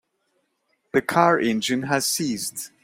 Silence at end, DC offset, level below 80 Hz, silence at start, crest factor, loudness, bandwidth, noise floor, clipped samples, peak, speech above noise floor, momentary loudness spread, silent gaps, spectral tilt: 0.15 s; under 0.1%; -64 dBFS; 0.95 s; 22 dB; -22 LUFS; 16.5 kHz; -71 dBFS; under 0.1%; -2 dBFS; 49 dB; 8 LU; none; -3.5 dB/octave